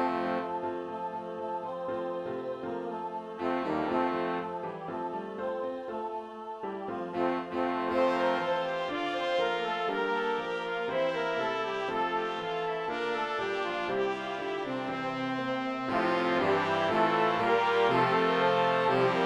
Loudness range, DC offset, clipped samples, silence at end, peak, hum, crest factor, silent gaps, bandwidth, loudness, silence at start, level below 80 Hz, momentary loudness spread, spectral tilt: 8 LU; under 0.1%; under 0.1%; 0 s; -14 dBFS; none; 18 dB; none; 11.5 kHz; -31 LUFS; 0 s; -68 dBFS; 11 LU; -5.5 dB/octave